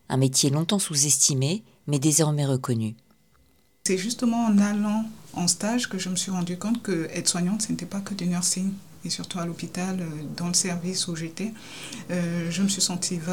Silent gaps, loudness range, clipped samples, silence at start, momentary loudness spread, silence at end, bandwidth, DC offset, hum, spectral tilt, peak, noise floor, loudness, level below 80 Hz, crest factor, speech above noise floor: none; 5 LU; under 0.1%; 0.1 s; 11 LU; 0 s; 19 kHz; 0.3%; none; -4 dB/octave; -6 dBFS; -63 dBFS; -25 LUFS; -64 dBFS; 20 dB; 37 dB